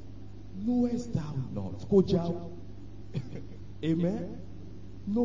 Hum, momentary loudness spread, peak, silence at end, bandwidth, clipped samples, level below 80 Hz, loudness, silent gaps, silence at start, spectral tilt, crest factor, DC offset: none; 21 LU; -12 dBFS; 0 s; 7.6 kHz; under 0.1%; -52 dBFS; -31 LUFS; none; 0 s; -8.5 dB/octave; 20 dB; 0.8%